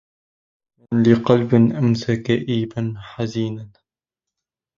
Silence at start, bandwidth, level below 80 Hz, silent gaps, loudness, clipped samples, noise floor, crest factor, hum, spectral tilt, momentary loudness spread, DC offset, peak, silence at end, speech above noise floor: 0.9 s; 7.4 kHz; -54 dBFS; none; -19 LUFS; under 0.1%; -87 dBFS; 20 dB; none; -8 dB/octave; 12 LU; under 0.1%; 0 dBFS; 1.1 s; 68 dB